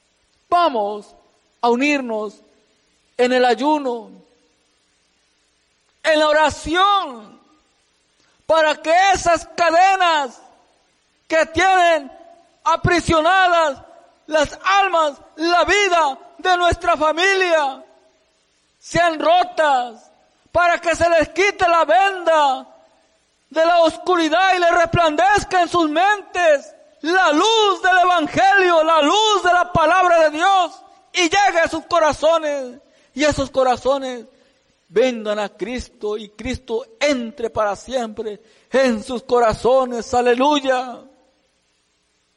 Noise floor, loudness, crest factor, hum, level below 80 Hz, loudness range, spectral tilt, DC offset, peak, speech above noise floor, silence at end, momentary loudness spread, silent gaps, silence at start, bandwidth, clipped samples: -65 dBFS; -17 LUFS; 12 dB; none; -44 dBFS; 7 LU; -3.5 dB/octave; under 0.1%; -6 dBFS; 48 dB; 1.35 s; 12 LU; none; 0.5 s; 11.5 kHz; under 0.1%